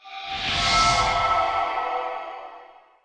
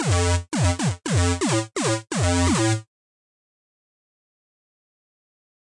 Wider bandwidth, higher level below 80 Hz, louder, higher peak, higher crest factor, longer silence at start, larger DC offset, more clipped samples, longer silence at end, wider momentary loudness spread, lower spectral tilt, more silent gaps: about the same, 10.5 kHz vs 11.5 kHz; about the same, -42 dBFS vs -46 dBFS; about the same, -22 LUFS vs -22 LUFS; about the same, -8 dBFS vs -10 dBFS; about the same, 16 dB vs 14 dB; about the same, 0.05 s vs 0 s; neither; neither; second, 0.35 s vs 2.8 s; first, 17 LU vs 4 LU; second, -2 dB/octave vs -4.5 dB/octave; neither